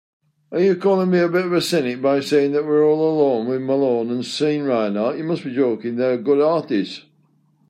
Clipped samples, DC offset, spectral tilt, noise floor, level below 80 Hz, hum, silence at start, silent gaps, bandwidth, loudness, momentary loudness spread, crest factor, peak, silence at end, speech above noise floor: under 0.1%; under 0.1%; -6 dB/octave; -60 dBFS; -70 dBFS; none; 0.5 s; none; 13.5 kHz; -19 LUFS; 7 LU; 14 dB; -6 dBFS; 0.7 s; 41 dB